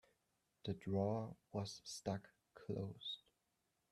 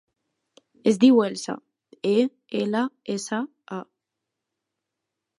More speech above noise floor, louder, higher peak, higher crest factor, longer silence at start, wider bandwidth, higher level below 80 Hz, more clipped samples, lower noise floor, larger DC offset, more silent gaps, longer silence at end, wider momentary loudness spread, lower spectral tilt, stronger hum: second, 41 dB vs 61 dB; second, -46 LUFS vs -23 LUFS; second, -28 dBFS vs -4 dBFS; about the same, 20 dB vs 20 dB; second, 0.65 s vs 0.85 s; first, 13 kHz vs 11.5 kHz; about the same, -78 dBFS vs -76 dBFS; neither; about the same, -86 dBFS vs -84 dBFS; neither; neither; second, 0.75 s vs 1.55 s; second, 12 LU vs 19 LU; about the same, -6 dB/octave vs -5.5 dB/octave; neither